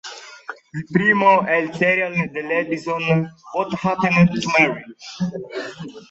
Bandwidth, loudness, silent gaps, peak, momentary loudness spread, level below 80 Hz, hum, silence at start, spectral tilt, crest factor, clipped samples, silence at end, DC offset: 8 kHz; -19 LUFS; none; -2 dBFS; 19 LU; -58 dBFS; none; 0.05 s; -6 dB/octave; 18 dB; under 0.1%; 0.1 s; under 0.1%